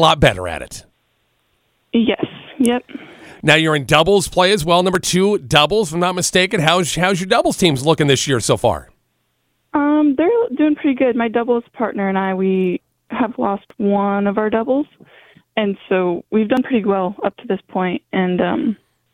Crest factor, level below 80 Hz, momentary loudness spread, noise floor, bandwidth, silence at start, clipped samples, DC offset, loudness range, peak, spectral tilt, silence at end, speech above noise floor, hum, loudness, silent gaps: 18 dB; -42 dBFS; 10 LU; -67 dBFS; 16.5 kHz; 0 s; under 0.1%; under 0.1%; 5 LU; 0 dBFS; -4.5 dB/octave; 0.4 s; 50 dB; none; -17 LUFS; none